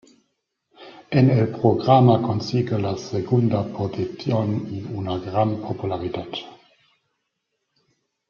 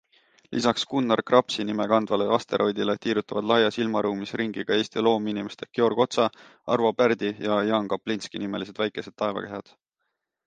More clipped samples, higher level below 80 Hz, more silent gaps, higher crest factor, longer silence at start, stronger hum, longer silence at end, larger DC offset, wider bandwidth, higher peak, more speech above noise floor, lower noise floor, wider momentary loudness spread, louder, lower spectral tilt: neither; first, -58 dBFS vs -68 dBFS; neither; about the same, 20 dB vs 22 dB; first, 0.8 s vs 0.5 s; neither; first, 1.75 s vs 0.85 s; neither; second, 7 kHz vs 9.4 kHz; about the same, -2 dBFS vs -2 dBFS; about the same, 56 dB vs 55 dB; about the same, -77 dBFS vs -80 dBFS; first, 13 LU vs 9 LU; first, -22 LUFS vs -25 LUFS; first, -8.5 dB/octave vs -5 dB/octave